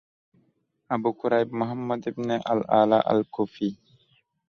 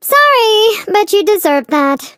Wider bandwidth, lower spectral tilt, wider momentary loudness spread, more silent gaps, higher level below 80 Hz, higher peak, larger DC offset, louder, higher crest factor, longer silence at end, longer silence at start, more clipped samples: second, 6.8 kHz vs 16 kHz; first, -7.5 dB/octave vs -1 dB/octave; first, 10 LU vs 5 LU; neither; about the same, -66 dBFS vs -64 dBFS; second, -6 dBFS vs 0 dBFS; neither; second, -25 LUFS vs -10 LUFS; first, 20 dB vs 10 dB; first, 0.75 s vs 0.1 s; first, 0.9 s vs 0.05 s; neither